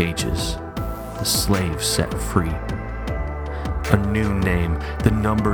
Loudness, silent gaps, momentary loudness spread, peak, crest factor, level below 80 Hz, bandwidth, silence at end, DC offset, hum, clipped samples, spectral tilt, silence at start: -22 LUFS; none; 9 LU; 0 dBFS; 22 dB; -28 dBFS; over 20 kHz; 0 s; under 0.1%; none; under 0.1%; -5 dB/octave; 0 s